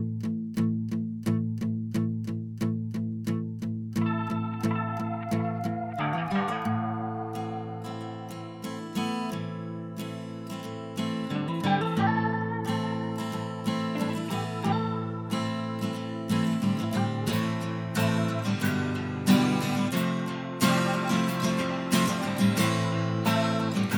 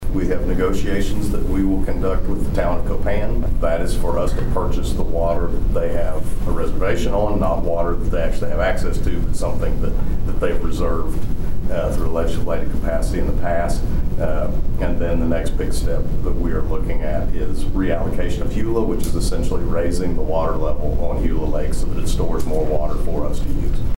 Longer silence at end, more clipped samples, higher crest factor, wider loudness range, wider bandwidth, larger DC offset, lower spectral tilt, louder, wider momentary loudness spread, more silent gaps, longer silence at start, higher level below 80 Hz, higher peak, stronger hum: about the same, 0 s vs 0 s; neither; first, 18 dB vs 10 dB; first, 7 LU vs 2 LU; about the same, 17.5 kHz vs 16.5 kHz; neither; about the same, -6 dB/octave vs -7 dB/octave; second, -29 LUFS vs -23 LUFS; first, 10 LU vs 4 LU; neither; about the same, 0 s vs 0 s; second, -64 dBFS vs -20 dBFS; second, -10 dBFS vs -6 dBFS; neither